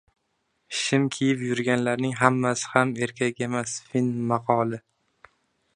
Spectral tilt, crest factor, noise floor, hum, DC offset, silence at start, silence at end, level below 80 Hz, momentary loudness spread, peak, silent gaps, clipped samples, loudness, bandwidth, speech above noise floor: -5 dB/octave; 24 dB; -74 dBFS; none; under 0.1%; 0.7 s; 0.95 s; -66 dBFS; 7 LU; -2 dBFS; none; under 0.1%; -25 LUFS; 10.5 kHz; 50 dB